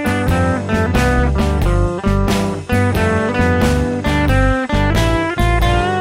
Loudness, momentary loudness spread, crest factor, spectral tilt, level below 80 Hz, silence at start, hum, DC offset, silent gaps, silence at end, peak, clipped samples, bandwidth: -16 LUFS; 3 LU; 12 dB; -6.5 dB/octave; -20 dBFS; 0 s; none; 0.1%; none; 0 s; -2 dBFS; under 0.1%; 16 kHz